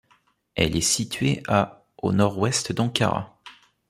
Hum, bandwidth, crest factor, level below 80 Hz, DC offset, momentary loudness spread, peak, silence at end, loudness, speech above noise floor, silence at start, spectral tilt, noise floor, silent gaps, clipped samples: none; 15.5 kHz; 22 dB; -50 dBFS; under 0.1%; 9 LU; -2 dBFS; 0.4 s; -23 LUFS; 41 dB; 0.55 s; -4 dB/octave; -63 dBFS; none; under 0.1%